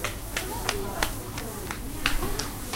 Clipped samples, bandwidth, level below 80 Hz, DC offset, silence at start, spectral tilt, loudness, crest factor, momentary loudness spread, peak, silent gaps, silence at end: under 0.1%; 16.5 kHz; -36 dBFS; under 0.1%; 0 s; -3 dB/octave; -31 LUFS; 28 dB; 6 LU; -2 dBFS; none; 0 s